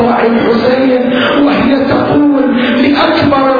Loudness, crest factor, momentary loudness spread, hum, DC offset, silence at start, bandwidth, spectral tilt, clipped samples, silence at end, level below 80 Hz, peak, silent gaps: -9 LUFS; 8 dB; 1 LU; none; under 0.1%; 0 s; 5 kHz; -7.5 dB/octave; under 0.1%; 0 s; -40 dBFS; 0 dBFS; none